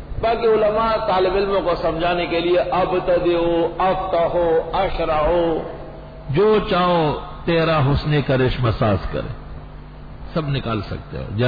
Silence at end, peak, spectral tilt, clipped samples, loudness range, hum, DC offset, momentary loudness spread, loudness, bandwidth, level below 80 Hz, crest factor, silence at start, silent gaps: 0 s; -8 dBFS; -9 dB/octave; under 0.1%; 2 LU; none; under 0.1%; 15 LU; -19 LUFS; 5 kHz; -34 dBFS; 12 dB; 0 s; none